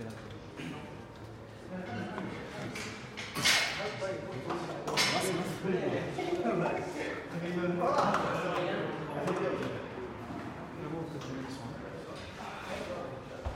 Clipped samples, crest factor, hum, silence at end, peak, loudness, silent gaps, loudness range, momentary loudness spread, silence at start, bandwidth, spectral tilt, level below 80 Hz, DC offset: under 0.1%; 24 dB; none; 0 s; -12 dBFS; -34 LUFS; none; 9 LU; 15 LU; 0 s; 16 kHz; -4 dB/octave; -58 dBFS; under 0.1%